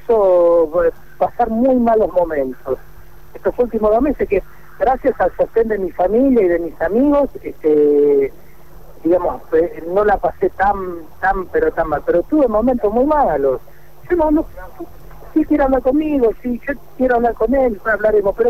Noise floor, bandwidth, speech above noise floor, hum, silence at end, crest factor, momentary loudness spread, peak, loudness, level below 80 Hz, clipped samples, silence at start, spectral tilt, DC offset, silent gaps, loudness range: -42 dBFS; 15 kHz; 26 dB; none; 0 s; 10 dB; 10 LU; -6 dBFS; -16 LUFS; -36 dBFS; under 0.1%; 0.1 s; -8.5 dB/octave; 2%; none; 3 LU